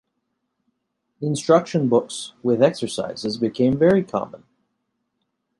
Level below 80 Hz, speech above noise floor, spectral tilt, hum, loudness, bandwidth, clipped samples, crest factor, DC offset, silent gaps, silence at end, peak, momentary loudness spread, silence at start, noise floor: -58 dBFS; 55 dB; -6 dB/octave; none; -21 LUFS; 11.5 kHz; under 0.1%; 20 dB; under 0.1%; none; 1.25 s; -2 dBFS; 10 LU; 1.2 s; -75 dBFS